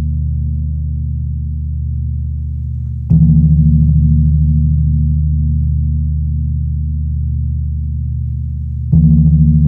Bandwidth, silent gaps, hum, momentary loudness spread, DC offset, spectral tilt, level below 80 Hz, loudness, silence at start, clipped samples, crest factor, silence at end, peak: 0.8 kHz; none; none; 11 LU; under 0.1%; -14.5 dB/octave; -18 dBFS; -15 LUFS; 0 s; under 0.1%; 12 dB; 0 s; -2 dBFS